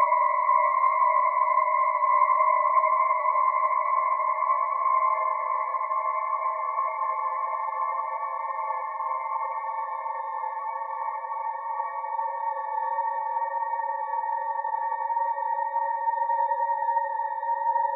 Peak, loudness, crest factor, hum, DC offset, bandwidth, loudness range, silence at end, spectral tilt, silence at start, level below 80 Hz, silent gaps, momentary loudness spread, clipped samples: -10 dBFS; -26 LUFS; 16 dB; none; under 0.1%; 3.9 kHz; 8 LU; 0 s; 0.5 dB/octave; 0 s; under -90 dBFS; none; 9 LU; under 0.1%